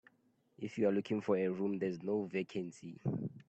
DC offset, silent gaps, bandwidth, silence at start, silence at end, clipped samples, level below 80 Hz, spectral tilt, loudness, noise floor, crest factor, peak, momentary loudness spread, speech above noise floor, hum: under 0.1%; none; 8.6 kHz; 0.6 s; 0.1 s; under 0.1%; -76 dBFS; -8 dB/octave; -37 LUFS; -74 dBFS; 18 dB; -20 dBFS; 10 LU; 38 dB; none